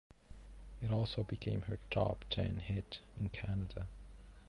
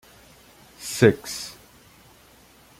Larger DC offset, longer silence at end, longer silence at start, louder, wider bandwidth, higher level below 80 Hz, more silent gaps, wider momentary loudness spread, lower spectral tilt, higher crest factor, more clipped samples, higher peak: neither; second, 0 s vs 1.25 s; second, 0.3 s vs 0.8 s; second, -40 LUFS vs -22 LUFS; second, 10.5 kHz vs 16.5 kHz; first, -52 dBFS vs -58 dBFS; neither; about the same, 20 LU vs 18 LU; first, -8 dB/octave vs -5 dB/octave; second, 18 dB vs 24 dB; neither; second, -22 dBFS vs -2 dBFS